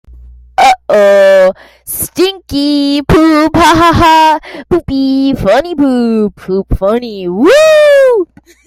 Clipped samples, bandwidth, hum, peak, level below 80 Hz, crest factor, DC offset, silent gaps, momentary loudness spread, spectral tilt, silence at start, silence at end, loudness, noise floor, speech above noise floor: under 0.1%; 16 kHz; none; 0 dBFS; -28 dBFS; 8 dB; under 0.1%; none; 11 LU; -5 dB/octave; 0.6 s; 0.4 s; -9 LUFS; -34 dBFS; 26 dB